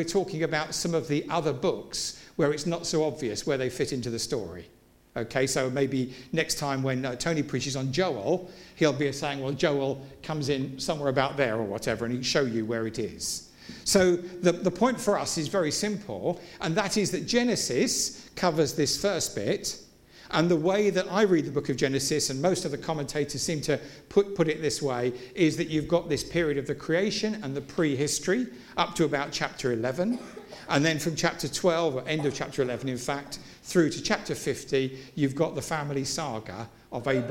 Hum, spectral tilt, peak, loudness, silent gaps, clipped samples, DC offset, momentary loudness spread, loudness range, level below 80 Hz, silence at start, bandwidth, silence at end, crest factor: none; -4.5 dB/octave; -6 dBFS; -28 LUFS; none; under 0.1%; under 0.1%; 7 LU; 3 LU; -56 dBFS; 0 s; 16.5 kHz; 0 s; 20 dB